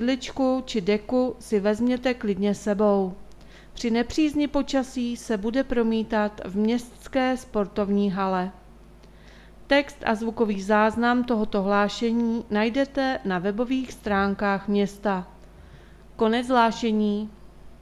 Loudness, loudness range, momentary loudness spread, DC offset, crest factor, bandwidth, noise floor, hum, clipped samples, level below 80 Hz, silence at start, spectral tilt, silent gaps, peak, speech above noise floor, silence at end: -25 LUFS; 3 LU; 6 LU; under 0.1%; 18 dB; 12.5 kHz; -48 dBFS; none; under 0.1%; -48 dBFS; 0 s; -6 dB/octave; none; -6 dBFS; 25 dB; 0.05 s